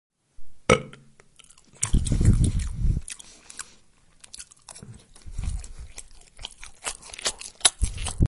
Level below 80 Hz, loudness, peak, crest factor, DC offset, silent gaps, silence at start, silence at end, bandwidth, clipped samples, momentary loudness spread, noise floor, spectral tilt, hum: -32 dBFS; -26 LUFS; 0 dBFS; 26 dB; under 0.1%; none; 0.4 s; 0 s; 11.5 kHz; under 0.1%; 22 LU; -56 dBFS; -4 dB/octave; none